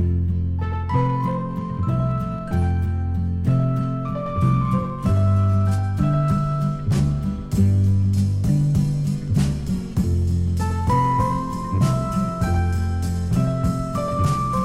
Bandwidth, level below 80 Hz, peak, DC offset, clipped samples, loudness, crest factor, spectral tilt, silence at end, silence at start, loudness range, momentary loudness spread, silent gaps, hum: 13 kHz; -34 dBFS; -6 dBFS; under 0.1%; under 0.1%; -22 LUFS; 14 dB; -8 dB/octave; 0 s; 0 s; 2 LU; 6 LU; none; none